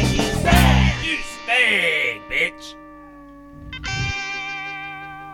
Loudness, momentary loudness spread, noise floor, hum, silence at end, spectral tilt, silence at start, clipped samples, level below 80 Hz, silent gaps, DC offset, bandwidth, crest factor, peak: -19 LUFS; 17 LU; -42 dBFS; 50 Hz at -55 dBFS; 0 s; -4.5 dB/octave; 0 s; under 0.1%; -28 dBFS; none; under 0.1%; 19 kHz; 18 dB; -4 dBFS